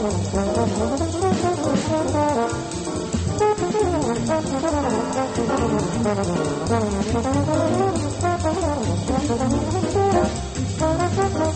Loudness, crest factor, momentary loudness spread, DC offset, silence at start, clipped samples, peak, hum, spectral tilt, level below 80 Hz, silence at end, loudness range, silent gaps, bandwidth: -22 LUFS; 14 dB; 3 LU; under 0.1%; 0 s; under 0.1%; -6 dBFS; none; -6 dB/octave; -36 dBFS; 0 s; 1 LU; none; 8.8 kHz